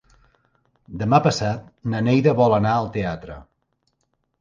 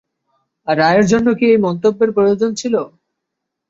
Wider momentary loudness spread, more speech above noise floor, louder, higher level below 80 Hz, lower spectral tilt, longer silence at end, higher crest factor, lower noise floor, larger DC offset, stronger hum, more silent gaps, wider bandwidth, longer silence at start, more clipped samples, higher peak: first, 19 LU vs 8 LU; second, 52 dB vs 64 dB; second, -20 LUFS vs -14 LUFS; about the same, -48 dBFS vs -52 dBFS; about the same, -7 dB/octave vs -6 dB/octave; first, 1 s vs 0.8 s; about the same, 20 dB vs 16 dB; second, -71 dBFS vs -78 dBFS; neither; neither; neither; first, 9.6 kHz vs 8 kHz; first, 0.9 s vs 0.65 s; neither; about the same, -2 dBFS vs 0 dBFS